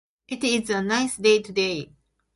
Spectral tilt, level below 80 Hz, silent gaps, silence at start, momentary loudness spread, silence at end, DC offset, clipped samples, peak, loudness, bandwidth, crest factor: -3.5 dB/octave; -62 dBFS; none; 0.3 s; 14 LU; 0.5 s; under 0.1%; under 0.1%; -6 dBFS; -23 LUFS; 11.5 kHz; 18 dB